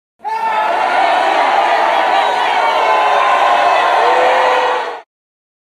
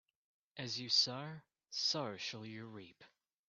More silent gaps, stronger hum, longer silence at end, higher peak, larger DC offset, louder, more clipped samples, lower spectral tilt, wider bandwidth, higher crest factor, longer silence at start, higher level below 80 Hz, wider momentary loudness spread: neither; neither; first, 0.6 s vs 0.4 s; first, 0 dBFS vs -20 dBFS; neither; first, -12 LUFS vs -37 LUFS; neither; about the same, -1.5 dB/octave vs -2.5 dB/octave; first, 13.5 kHz vs 8.4 kHz; second, 12 dB vs 22 dB; second, 0.25 s vs 0.55 s; first, -60 dBFS vs -86 dBFS; second, 6 LU vs 22 LU